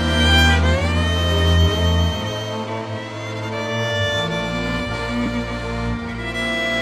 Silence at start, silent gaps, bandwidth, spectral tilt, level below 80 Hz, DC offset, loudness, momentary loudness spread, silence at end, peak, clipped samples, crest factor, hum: 0 s; none; 12.5 kHz; -5 dB/octave; -28 dBFS; under 0.1%; -20 LUFS; 11 LU; 0 s; -2 dBFS; under 0.1%; 16 dB; none